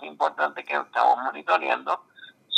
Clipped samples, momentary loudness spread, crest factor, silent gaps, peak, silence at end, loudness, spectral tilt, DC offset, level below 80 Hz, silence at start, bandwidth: under 0.1%; 7 LU; 20 dB; none; -6 dBFS; 0 s; -25 LUFS; -2 dB/octave; under 0.1%; under -90 dBFS; 0 s; 9 kHz